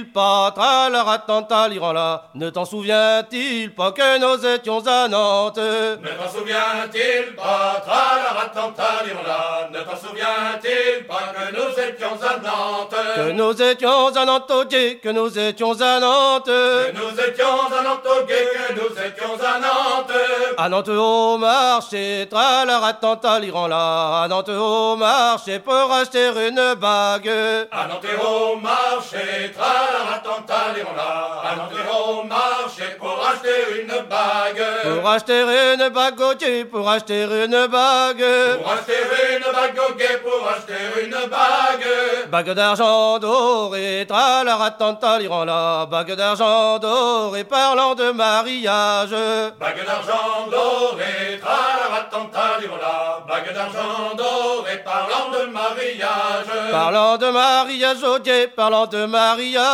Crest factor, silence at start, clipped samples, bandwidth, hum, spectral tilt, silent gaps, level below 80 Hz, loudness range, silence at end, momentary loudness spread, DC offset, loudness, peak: 16 dB; 0 s; under 0.1%; 15.5 kHz; none; -2.5 dB/octave; none; -72 dBFS; 4 LU; 0 s; 8 LU; under 0.1%; -18 LUFS; -2 dBFS